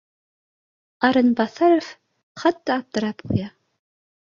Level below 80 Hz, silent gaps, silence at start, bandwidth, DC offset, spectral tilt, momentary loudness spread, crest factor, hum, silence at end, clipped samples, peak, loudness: -54 dBFS; 2.23-2.35 s; 1 s; 7.4 kHz; under 0.1%; -6.5 dB/octave; 9 LU; 20 dB; none; 0.85 s; under 0.1%; -2 dBFS; -21 LUFS